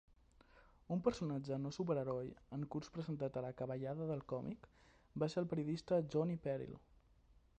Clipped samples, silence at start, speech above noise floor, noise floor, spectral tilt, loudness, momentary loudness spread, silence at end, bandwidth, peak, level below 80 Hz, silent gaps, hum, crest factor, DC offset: under 0.1%; 0.55 s; 28 dB; -70 dBFS; -8 dB/octave; -42 LUFS; 9 LU; 0.8 s; 8.8 kHz; -22 dBFS; -68 dBFS; none; none; 20 dB; under 0.1%